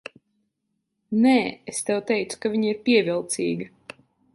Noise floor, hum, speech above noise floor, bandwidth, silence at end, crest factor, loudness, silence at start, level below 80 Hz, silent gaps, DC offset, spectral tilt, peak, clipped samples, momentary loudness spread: -77 dBFS; none; 55 dB; 11.5 kHz; 0.65 s; 18 dB; -23 LUFS; 1.1 s; -68 dBFS; none; under 0.1%; -4.5 dB/octave; -6 dBFS; under 0.1%; 11 LU